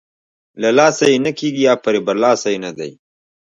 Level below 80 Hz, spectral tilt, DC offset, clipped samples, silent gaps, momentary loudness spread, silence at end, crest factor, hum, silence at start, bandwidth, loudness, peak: -64 dBFS; -4 dB/octave; under 0.1%; under 0.1%; none; 13 LU; 0.7 s; 16 dB; none; 0.55 s; 10.5 kHz; -15 LUFS; 0 dBFS